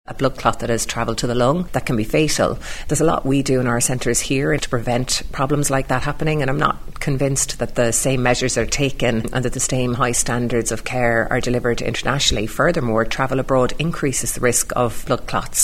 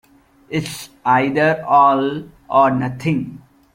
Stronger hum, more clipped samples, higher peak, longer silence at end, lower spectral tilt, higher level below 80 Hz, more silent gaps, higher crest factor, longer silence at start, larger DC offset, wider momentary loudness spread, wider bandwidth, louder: neither; neither; about the same, 0 dBFS vs -2 dBFS; second, 0 s vs 0.35 s; second, -4 dB/octave vs -6 dB/octave; first, -32 dBFS vs -54 dBFS; neither; about the same, 18 dB vs 16 dB; second, 0.1 s vs 0.5 s; first, 0.4% vs under 0.1%; second, 4 LU vs 13 LU; about the same, 16 kHz vs 16.5 kHz; about the same, -19 LUFS vs -17 LUFS